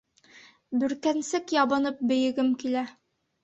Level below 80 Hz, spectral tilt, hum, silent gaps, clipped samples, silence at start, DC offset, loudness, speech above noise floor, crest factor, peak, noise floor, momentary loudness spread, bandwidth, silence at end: -70 dBFS; -3.5 dB/octave; none; none; under 0.1%; 0.35 s; under 0.1%; -27 LUFS; 29 dB; 18 dB; -10 dBFS; -55 dBFS; 7 LU; 8.2 kHz; 0.5 s